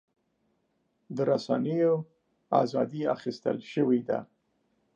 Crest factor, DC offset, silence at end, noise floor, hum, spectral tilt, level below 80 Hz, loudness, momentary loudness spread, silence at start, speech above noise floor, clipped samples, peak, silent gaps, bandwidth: 20 dB; under 0.1%; 0.7 s; -75 dBFS; none; -7.5 dB/octave; -80 dBFS; -29 LUFS; 7 LU; 1.1 s; 47 dB; under 0.1%; -10 dBFS; none; 7.6 kHz